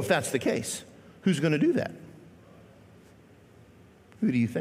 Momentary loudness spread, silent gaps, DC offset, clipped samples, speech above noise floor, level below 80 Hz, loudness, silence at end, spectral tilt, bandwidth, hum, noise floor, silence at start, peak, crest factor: 19 LU; none; under 0.1%; under 0.1%; 28 dB; -68 dBFS; -28 LUFS; 0 s; -5.5 dB/octave; 16 kHz; none; -55 dBFS; 0 s; -12 dBFS; 18 dB